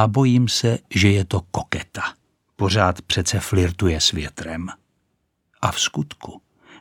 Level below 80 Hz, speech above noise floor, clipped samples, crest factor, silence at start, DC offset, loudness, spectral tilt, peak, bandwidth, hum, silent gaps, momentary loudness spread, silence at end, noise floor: -40 dBFS; 51 dB; under 0.1%; 20 dB; 0 s; under 0.1%; -21 LUFS; -4.5 dB/octave; 0 dBFS; 17.5 kHz; none; none; 13 LU; 0.4 s; -71 dBFS